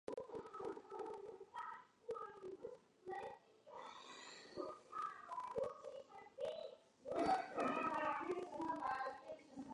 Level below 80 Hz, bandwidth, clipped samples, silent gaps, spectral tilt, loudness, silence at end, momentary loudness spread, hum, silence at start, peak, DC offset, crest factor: -80 dBFS; 11 kHz; under 0.1%; none; -4.5 dB/octave; -47 LUFS; 0 s; 15 LU; none; 0.1 s; -28 dBFS; under 0.1%; 20 dB